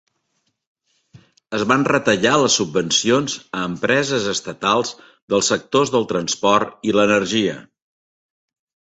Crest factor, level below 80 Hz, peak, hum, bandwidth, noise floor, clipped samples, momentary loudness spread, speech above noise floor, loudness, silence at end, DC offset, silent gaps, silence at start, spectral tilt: 18 dB; -56 dBFS; -2 dBFS; none; 8.4 kHz; -71 dBFS; under 0.1%; 8 LU; 52 dB; -18 LUFS; 1.25 s; under 0.1%; 5.22-5.28 s; 1.15 s; -3.5 dB/octave